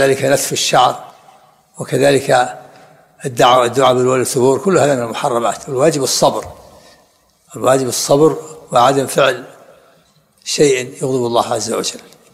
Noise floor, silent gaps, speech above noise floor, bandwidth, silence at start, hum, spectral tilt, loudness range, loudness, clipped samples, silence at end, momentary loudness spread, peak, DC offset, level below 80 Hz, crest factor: -54 dBFS; none; 40 dB; 16 kHz; 0 s; none; -4 dB/octave; 3 LU; -14 LUFS; under 0.1%; 0.35 s; 14 LU; 0 dBFS; under 0.1%; -54 dBFS; 14 dB